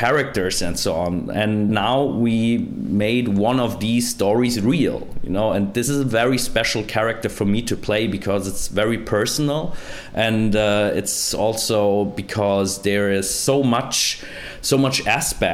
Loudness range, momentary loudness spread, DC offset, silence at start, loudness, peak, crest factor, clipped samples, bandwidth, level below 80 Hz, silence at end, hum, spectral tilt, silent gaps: 2 LU; 5 LU; under 0.1%; 0 s; -20 LUFS; -4 dBFS; 16 dB; under 0.1%; 16.5 kHz; -40 dBFS; 0 s; none; -4.5 dB/octave; none